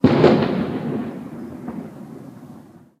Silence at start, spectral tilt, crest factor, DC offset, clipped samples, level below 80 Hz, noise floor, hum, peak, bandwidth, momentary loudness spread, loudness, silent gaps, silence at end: 0.05 s; -8.5 dB/octave; 20 dB; under 0.1%; under 0.1%; -52 dBFS; -44 dBFS; none; 0 dBFS; 9.6 kHz; 24 LU; -20 LUFS; none; 0.4 s